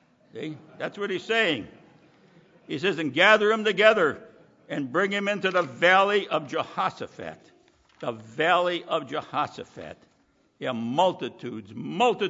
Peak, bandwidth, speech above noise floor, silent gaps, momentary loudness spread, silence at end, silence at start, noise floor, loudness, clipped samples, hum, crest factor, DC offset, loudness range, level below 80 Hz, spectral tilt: -4 dBFS; 7.8 kHz; 40 dB; none; 19 LU; 0 s; 0.35 s; -65 dBFS; -24 LUFS; under 0.1%; none; 24 dB; under 0.1%; 7 LU; -74 dBFS; -4.5 dB/octave